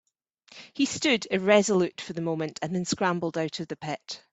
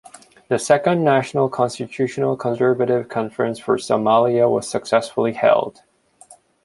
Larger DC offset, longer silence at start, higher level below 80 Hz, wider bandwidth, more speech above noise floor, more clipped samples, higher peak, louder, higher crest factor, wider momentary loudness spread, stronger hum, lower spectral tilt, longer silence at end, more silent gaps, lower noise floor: neither; about the same, 0.55 s vs 0.5 s; about the same, -66 dBFS vs -62 dBFS; second, 8.4 kHz vs 11.5 kHz; about the same, 33 dB vs 31 dB; neither; second, -6 dBFS vs 0 dBFS; second, -27 LUFS vs -19 LUFS; about the same, 20 dB vs 18 dB; first, 13 LU vs 8 LU; neither; about the same, -4.5 dB/octave vs -5.5 dB/octave; second, 0.15 s vs 0.3 s; neither; first, -60 dBFS vs -49 dBFS